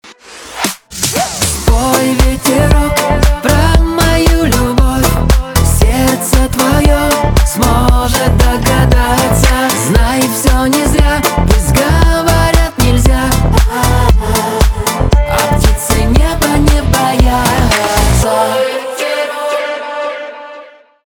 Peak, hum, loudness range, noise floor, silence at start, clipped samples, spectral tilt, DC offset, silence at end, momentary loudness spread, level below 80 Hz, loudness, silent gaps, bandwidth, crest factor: 0 dBFS; none; 2 LU; -35 dBFS; 0.05 s; under 0.1%; -4.5 dB/octave; under 0.1%; 0.4 s; 6 LU; -14 dBFS; -11 LUFS; none; over 20 kHz; 10 dB